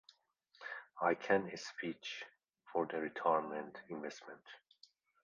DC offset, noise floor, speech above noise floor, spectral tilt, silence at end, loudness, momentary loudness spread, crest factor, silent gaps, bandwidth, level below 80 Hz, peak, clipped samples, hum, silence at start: under 0.1%; -73 dBFS; 34 dB; -3 dB/octave; 0.65 s; -39 LUFS; 19 LU; 22 dB; none; 7.4 kHz; -84 dBFS; -18 dBFS; under 0.1%; none; 0.6 s